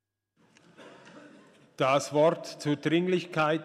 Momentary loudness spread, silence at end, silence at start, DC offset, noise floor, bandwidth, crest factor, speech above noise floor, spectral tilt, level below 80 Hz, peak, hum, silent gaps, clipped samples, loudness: 6 LU; 0 s; 0.8 s; under 0.1%; -69 dBFS; 14 kHz; 18 dB; 43 dB; -5.5 dB/octave; -78 dBFS; -12 dBFS; none; none; under 0.1%; -27 LUFS